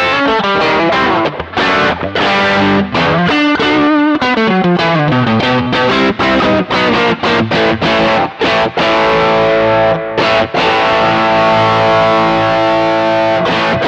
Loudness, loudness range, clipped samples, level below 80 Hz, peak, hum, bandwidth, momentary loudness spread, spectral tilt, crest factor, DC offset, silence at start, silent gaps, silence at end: -11 LUFS; 1 LU; under 0.1%; -40 dBFS; -2 dBFS; none; 9 kHz; 2 LU; -6 dB/octave; 8 dB; under 0.1%; 0 s; none; 0 s